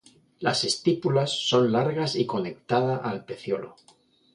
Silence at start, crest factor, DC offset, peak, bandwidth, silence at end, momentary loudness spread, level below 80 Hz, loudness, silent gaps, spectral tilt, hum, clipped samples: 0.4 s; 18 dB; under 0.1%; -8 dBFS; 11.5 kHz; 0.65 s; 10 LU; -66 dBFS; -25 LUFS; none; -5 dB/octave; none; under 0.1%